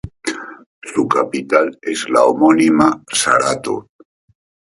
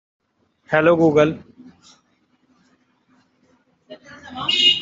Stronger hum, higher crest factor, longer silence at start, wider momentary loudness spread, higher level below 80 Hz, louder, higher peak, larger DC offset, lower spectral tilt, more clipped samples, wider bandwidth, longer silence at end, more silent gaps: neither; about the same, 16 dB vs 20 dB; second, 0.05 s vs 0.7 s; second, 14 LU vs 23 LU; first, -50 dBFS vs -62 dBFS; about the same, -15 LUFS vs -17 LUFS; about the same, 0 dBFS vs -2 dBFS; neither; about the same, -4 dB/octave vs -4.5 dB/octave; neither; first, 11.5 kHz vs 7.8 kHz; first, 0.95 s vs 0 s; first, 0.66-0.82 s vs none